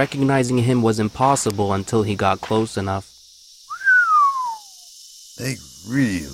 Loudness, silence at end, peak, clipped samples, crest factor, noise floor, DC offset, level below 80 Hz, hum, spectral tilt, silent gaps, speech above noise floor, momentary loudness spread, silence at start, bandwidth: -19 LUFS; 0 s; -4 dBFS; under 0.1%; 16 dB; -47 dBFS; under 0.1%; -52 dBFS; none; -5 dB/octave; none; 27 dB; 20 LU; 0 s; 16 kHz